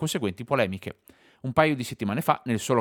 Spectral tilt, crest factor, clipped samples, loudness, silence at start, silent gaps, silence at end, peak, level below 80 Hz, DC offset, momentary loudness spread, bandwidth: -5.5 dB/octave; 22 dB; under 0.1%; -26 LUFS; 0 s; none; 0 s; -4 dBFS; -62 dBFS; under 0.1%; 13 LU; 19.5 kHz